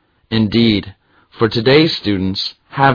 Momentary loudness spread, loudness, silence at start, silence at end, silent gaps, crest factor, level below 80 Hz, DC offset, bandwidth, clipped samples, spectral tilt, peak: 10 LU; -15 LUFS; 0.3 s; 0 s; none; 16 dB; -44 dBFS; under 0.1%; 5.4 kHz; under 0.1%; -7 dB/octave; 0 dBFS